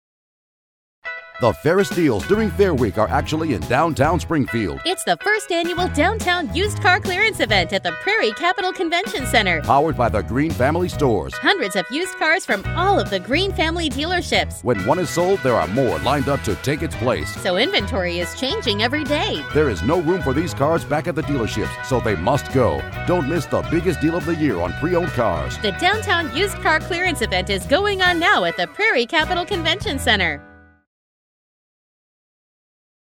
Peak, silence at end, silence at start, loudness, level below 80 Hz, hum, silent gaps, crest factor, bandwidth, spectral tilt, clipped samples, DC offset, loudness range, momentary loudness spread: -2 dBFS; 2.5 s; 1.05 s; -19 LUFS; -36 dBFS; none; none; 18 dB; 18 kHz; -5 dB/octave; under 0.1%; under 0.1%; 3 LU; 5 LU